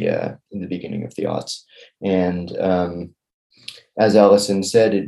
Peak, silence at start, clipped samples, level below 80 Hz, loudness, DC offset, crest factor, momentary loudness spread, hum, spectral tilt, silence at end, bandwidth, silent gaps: 0 dBFS; 0 s; under 0.1%; -58 dBFS; -19 LUFS; under 0.1%; 20 dB; 19 LU; none; -5.5 dB/octave; 0 s; 12.5 kHz; 3.34-3.50 s